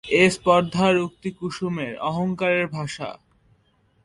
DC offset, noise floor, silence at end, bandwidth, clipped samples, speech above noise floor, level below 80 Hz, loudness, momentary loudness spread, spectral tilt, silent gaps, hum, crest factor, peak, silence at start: under 0.1%; -63 dBFS; 0.9 s; 11.5 kHz; under 0.1%; 41 dB; -56 dBFS; -22 LUFS; 13 LU; -5.5 dB/octave; none; none; 20 dB; -2 dBFS; 0.05 s